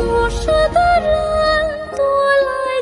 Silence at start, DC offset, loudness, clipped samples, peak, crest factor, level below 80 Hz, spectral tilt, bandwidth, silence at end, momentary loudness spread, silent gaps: 0 s; under 0.1%; -15 LUFS; under 0.1%; -4 dBFS; 12 dB; -28 dBFS; -4.5 dB/octave; 11.5 kHz; 0 s; 4 LU; none